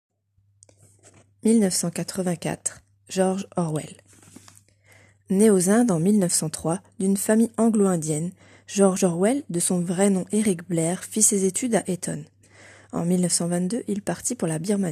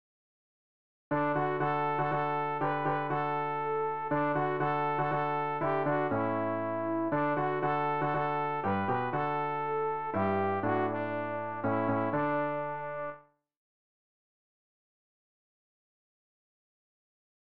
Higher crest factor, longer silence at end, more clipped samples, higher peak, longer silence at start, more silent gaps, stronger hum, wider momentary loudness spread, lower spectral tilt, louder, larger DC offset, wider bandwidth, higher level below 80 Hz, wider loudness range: first, 20 dB vs 14 dB; second, 0 s vs 4 s; neither; first, -4 dBFS vs -18 dBFS; first, 1.45 s vs 1.1 s; neither; neither; first, 10 LU vs 4 LU; about the same, -5 dB/octave vs -6 dB/octave; first, -23 LUFS vs -31 LUFS; second, under 0.1% vs 0.3%; first, 14.5 kHz vs 5.6 kHz; about the same, -66 dBFS vs -68 dBFS; about the same, 5 LU vs 4 LU